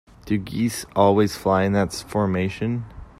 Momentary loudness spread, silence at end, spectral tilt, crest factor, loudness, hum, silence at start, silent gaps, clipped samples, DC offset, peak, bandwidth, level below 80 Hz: 9 LU; 0.15 s; -6 dB/octave; 18 dB; -22 LUFS; none; 0.25 s; none; under 0.1%; under 0.1%; -4 dBFS; 15.5 kHz; -48 dBFS